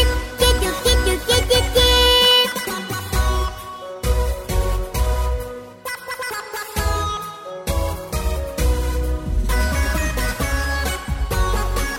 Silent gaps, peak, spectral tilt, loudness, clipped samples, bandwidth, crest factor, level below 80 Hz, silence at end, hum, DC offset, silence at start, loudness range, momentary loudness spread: none; -4 dBFS; -3.5 dB/octave; -20 LUFS; under 0.1%; 16.5 kHz; 16 dB; -22 dBFS; 0 s; none; under 0.1%; 0 s; 9 LU; 14 LU